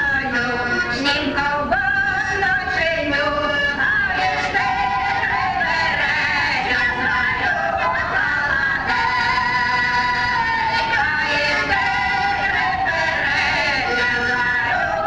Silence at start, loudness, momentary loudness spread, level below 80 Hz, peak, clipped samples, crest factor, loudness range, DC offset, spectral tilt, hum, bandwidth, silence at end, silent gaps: 0 s; -18 LUFS; 2 LU; -40 dBFS; -6 dBFS; under 0.1%; 14 dB; 1 LU; under 0.1%; -3.5 dB/octave; none; 11.5 kHz; 0 s; none